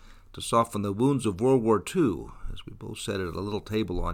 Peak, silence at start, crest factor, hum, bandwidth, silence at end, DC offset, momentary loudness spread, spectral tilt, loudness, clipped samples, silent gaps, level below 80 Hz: -10 dBFS; 0.05 s; 16 dB; none; 16.5 kHz; 0 s; under 0.1%; 18 LU; -6 dB/octave; -27 LUFS; under 0.1%; none; -42 dBFS